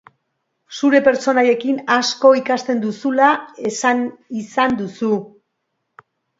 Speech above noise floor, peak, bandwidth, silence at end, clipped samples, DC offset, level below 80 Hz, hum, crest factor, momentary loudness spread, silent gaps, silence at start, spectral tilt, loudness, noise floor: 57 dB; 0 dBFS; 8 kHz; 1.1 s; under 0.1%; under 0.1%; -62 dBFS; none; 18 dB; 10 LU; none; 0.7 s; -4 dB/octave; -17 LUFS; -74 dBFS